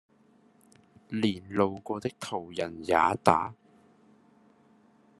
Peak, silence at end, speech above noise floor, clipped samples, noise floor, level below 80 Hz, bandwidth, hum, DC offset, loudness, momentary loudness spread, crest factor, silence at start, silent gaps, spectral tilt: -2 dBFS; 1.65 s; 34 dB; under 0.1%; -62 dBFS; -68 dBFS; 12.5 kHz; none; under 0.1%; -29 LUFS; 12 LU; 30 dB; 1.1 s; none; -5.5 dB/octave